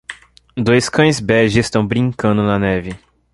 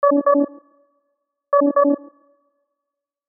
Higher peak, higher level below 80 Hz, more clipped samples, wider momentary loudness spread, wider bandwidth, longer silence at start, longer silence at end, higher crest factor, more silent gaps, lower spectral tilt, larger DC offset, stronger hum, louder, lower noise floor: first, -2 dBFS vs -6 dBFS; first, -40 dBFS vs -88 dBFS; neither; first, 17 LU vs 9 LU; first, 11.5 kHz vs 1.9 kHz; about the same, 0.1 s vs 0 s; second, 0.35 s vs 1.3 s; about the same, 14 dB vs 16 dB; neither; first, -5.5 dB/octave vs 0.5 dB/octave; neither; neither; first, -15 LUFS vs -18 LUFS; second, -37 dBFS vs -83 dBFS